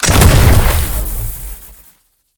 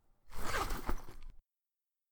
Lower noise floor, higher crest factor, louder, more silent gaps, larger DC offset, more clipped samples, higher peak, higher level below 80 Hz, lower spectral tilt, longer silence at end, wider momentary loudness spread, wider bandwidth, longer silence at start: second, -52 dBFS vs under -90 dBFS; second, 12 dB vs 18 dB; first, -12 LUFS vs -41 LUFS; neither; neither; first, 0.4% vs under 0.1%; first, 0 dBFS vs -20 dBFS; first, -16 dBFS vs -44 dBFS; about the same, -4.5 dB/octave vs -3.5 dB/octave; about the same, 0.7 s vs 0.7 s; about the same, 20 LU vs 21 LU; about the same, over 20 kHz vs over 20 kHz; second, 0 s vs 0.25 s